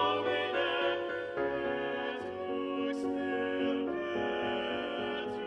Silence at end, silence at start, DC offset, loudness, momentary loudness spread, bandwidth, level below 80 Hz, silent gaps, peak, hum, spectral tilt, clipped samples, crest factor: 0 s; 0 s; under 0.1%; -34 LUFS; 5 LU; 9.6 kHz; -66 dBFS; none; -18 dBFS; none; -5.5 dB/octave; under 0.1%; 14 dB